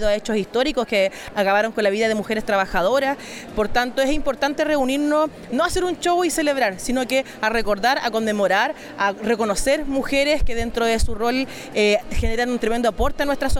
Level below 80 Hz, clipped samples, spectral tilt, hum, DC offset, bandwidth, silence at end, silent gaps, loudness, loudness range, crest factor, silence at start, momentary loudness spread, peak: -34 dBFS; under 0.1%; -4 dB/octave; none; under 0.1%; 17.5 kHz; 0 s; none; -21 LUFS; 1 LU; 14 dB; 0 s; 4 LU; -6 dBFS